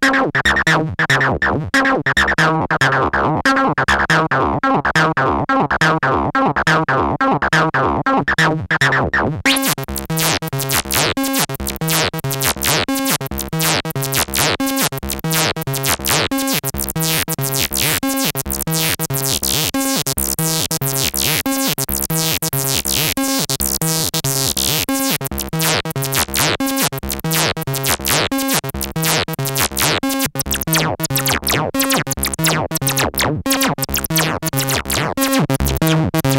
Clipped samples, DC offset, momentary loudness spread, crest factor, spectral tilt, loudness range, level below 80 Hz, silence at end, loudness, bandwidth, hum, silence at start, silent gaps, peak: under 0.1%; under 0.1%; 4 LU; 14 dB; -3 dB/octave; 2 LU; -36 dBFS; 0 s; -16 LUFS; 16.5 kHz; none; 0 s; none; -4 dBFS